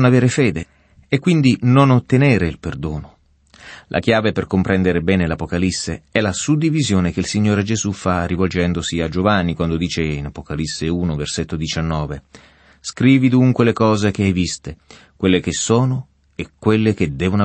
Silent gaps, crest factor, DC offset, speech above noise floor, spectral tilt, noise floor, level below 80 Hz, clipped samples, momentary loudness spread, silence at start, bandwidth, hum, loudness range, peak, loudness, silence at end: none; 16 dB; under 0.1%; 32 dB; -6 dB/octave; -49 dBFS; -38 dBFS; under 0.1%; 13 LU; 0 s; 8.8 kHz; none; 4 LU; -2 dBFS; -18 LUFS; 0 s